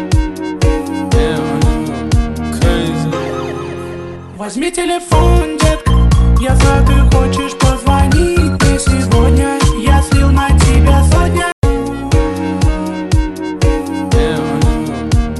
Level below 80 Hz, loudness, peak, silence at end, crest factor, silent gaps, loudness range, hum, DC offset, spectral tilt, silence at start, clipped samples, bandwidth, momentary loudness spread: -16 dBFS; -13 LUFS; 0 dBFS; 0 s; 12 dB; 11.52-11.62 s; 5 LU; none; under 0.1%; -6 dB/octave; 0 s; under 0.1%; 12.5 kHz; 9 LU